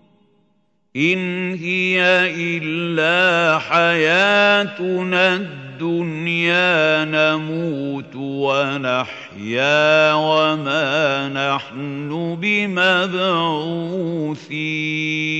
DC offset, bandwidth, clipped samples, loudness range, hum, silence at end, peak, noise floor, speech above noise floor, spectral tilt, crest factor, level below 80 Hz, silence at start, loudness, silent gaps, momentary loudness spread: under 0.1%; 8.4 kHz; under 0.1%; 4 LU; none; 0 s; -2 dBFS; -65 dBFS; 46 dB; -5 dB/octave; 16 dB; -70 dBFS; 0.95 s; -17 LUFS; none; 11 LU